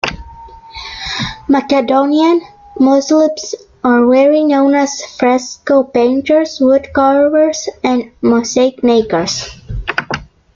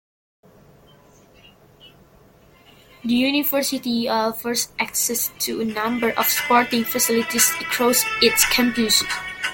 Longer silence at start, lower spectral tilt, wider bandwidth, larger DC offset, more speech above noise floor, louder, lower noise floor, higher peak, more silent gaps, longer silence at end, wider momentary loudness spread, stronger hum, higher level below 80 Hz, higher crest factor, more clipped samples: second, 0.05 s vs 1.85 s; first, -4.5 dB/octave vs -1.5 dB/octave; second, 7.6 kHz vs 17 kHz; neither; second, 23 dB vs 31 dB; first, -13 LUFS vs -19 LUFS; second, -35 dBFS vs -52 dBFS; about the same, 0 dBFS vs -2 dBFS; neither; first, 0.3 s vs 0 s; first, 13 LU vs 7 LU; neither; first, -38 dBFS vs -54 dBFS; second, 12 dB vs 22 dB; neither